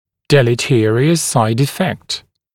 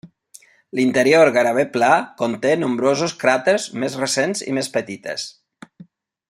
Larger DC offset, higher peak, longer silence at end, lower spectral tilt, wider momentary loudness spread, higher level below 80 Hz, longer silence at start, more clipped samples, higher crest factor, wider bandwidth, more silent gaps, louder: neither; about the same, 0 dBFS vs -2 dBFS; about the same, 0.35 s vs 0.45 s; about the same, -5 dB/octave vs -4 dB/octave; second, 10 LU vs 14 LU; first, -50 dBFS vs -66 dBFS; first, 0.3 s vs 0.05 s; neither; about the same, 14 dB vs 18 dB; about the same, 17 kHz vs 16 kHz; neither; first, -15 LUFS vs -18 LUFS